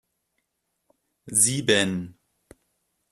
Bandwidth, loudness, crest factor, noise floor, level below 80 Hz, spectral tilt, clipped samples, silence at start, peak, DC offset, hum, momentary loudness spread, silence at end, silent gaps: 14 kHz; -21 LUFS; 22 dB; -78 dBFS; -64 dBFS; -2.5 dB/octave; under 0.1%; 1.25 s; -6 dBFS; under 0.1%; none; 14 LU; 1 s; none